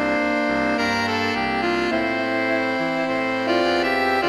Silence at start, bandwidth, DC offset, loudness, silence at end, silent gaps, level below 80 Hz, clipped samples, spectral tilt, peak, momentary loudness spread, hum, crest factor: 0 s; 14 kHz; under 0.1%; -21 LUFS; 0 s; none; -50 dBFS; under 0.1%; -4.5 dB/octave; -8 dBFS; 3 LU; none; 12 dB